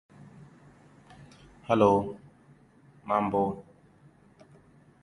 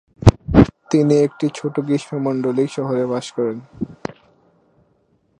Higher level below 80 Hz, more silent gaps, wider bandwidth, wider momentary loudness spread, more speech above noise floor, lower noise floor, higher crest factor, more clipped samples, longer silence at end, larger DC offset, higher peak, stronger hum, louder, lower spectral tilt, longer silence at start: second, -62 dBFS vs -34 dBFS; neither; about the same, 11 kHz vs 10.5 kHz; first, 26 LU vs 15 LU; second, 33 dB vs 42 dB; about the same, -58 dBFS vs -61 dBFS; first, 24 dB vs 18 dB; neither; about the same, 1.4 s vs 1.5 s; neither; second, -8 dBFS vs 0 dBFS; neither; second, -27 LUFS vs -19 LUFS; about the same, -7.5 dB/octave vs -7.5 dB/octave; first, 1.7 s vs 0.2 s